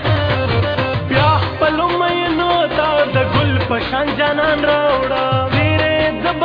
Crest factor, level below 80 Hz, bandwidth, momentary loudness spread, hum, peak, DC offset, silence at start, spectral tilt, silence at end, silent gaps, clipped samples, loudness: 14 dB; -36 dBFS; 5.2 kHz; 3 LU; none; -2 dBFS; under 0.1%; 0 s; -8 dB/octave; 0 s; none; under 0.1%; -15 LUFS